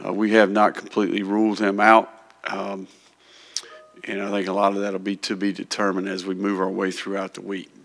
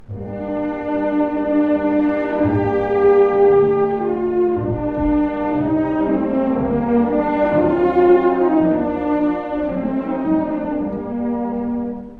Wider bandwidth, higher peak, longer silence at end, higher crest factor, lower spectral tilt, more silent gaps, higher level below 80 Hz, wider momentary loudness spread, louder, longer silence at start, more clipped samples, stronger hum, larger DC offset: first, 11 kHz vs 4.6 kHz; about the same, 0 dBFS vs -2 dBFS; first, 0.2 s vs 0 s; first, 22 dB vs 14 dB; second, -5 dB/octave vs -10 dB/octave; neither; second, -76 dBFS vs -40 dBFS; first, 16 LU vs 9 LU; second, -22 LUFS vs -18 LUFS; about the same, 0 s vs 0 s; neither; neither; neither